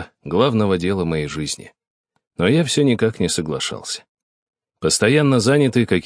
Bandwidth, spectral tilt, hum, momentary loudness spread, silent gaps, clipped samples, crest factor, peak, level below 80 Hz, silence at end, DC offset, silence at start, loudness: 10.5 kHz; -5 dB/octave; none; 12 LU; 1.87-2.04 s, 2.27-2.31 s, 4.09-4.15 s, 4.23-4.53 s; under 0.1%; 18 dB; -2 dBFS; -48 dBFS; 0.05 s; under 0.1%; 0 s; -18 LUFS